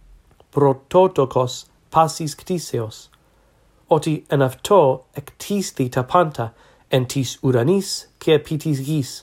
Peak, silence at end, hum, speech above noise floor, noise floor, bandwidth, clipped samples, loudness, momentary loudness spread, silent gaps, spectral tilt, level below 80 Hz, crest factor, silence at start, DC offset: 0 dBFS; 0.05 s; none; 37 dB; -57 dBFS; 16.5 kHz; under 0.1%; -20 LUFS; 11 LU; none; -6 dB/octave; -54 dBFS; 20 dB; 0.55 s; under 0.1%